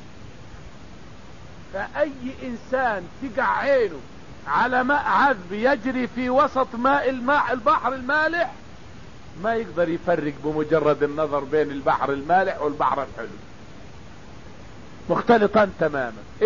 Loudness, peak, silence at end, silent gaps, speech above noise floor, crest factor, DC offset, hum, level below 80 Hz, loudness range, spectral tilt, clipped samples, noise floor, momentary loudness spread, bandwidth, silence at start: -22 LUFS; -4 dBFS; 0 s; none; 21 dB; 18 dB; 0.8%; none; -50 dBFS; 5 LU; -6.5 dB/octave; under 0.1%; -43 dBFS; 19 LU; 7.4 kHz; 0 s